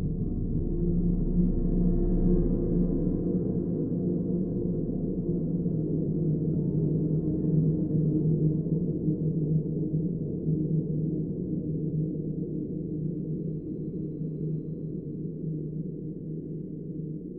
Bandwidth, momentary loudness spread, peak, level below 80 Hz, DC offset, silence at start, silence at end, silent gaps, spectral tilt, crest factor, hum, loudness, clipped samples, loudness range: 1.4 kHz; 9 LU; -12 dBFS; -36 dBFS; under 0.1%; 0 s; 0 s; none; -16.5 dB/octave; 16 dB; none; -29 LUFS; under 0.1%; 7 LU